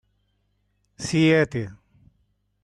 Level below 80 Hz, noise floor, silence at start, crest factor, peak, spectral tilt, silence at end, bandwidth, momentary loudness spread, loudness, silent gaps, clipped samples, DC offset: -56 dBFS; -70 dBFS; 1 s; 18 dB; -8 dBFS; -5.5 dB/octave; 0.9 s; 11.5 kHz; 16 LU; -21 LUFS; none; under 0.1%; under 0.1%